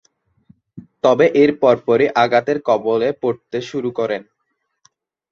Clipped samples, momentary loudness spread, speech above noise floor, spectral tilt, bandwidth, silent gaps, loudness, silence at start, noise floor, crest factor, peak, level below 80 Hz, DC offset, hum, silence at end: under 0.1%; 10 LU; 56 dB; -6 dB/octave; 7 kHz; none; -17 LUFS; 0.75 s; -72 dBFS; 16 dB; -2 dBFS; -62 dBFS; under 0.1%; none; 1.1 s